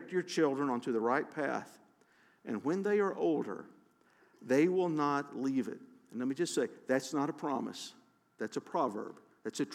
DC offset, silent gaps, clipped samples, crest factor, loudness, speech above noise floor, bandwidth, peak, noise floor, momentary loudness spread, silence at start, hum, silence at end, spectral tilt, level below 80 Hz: under 0.1%; none; under 0.1%; 18 dB; -34 LUFS; 34 dB; 15 kHz; -18 dBFS; -67 dBFS; 15 LU; 0 s; none; 0 s; -5.5 dB/octave; under -90 dBFS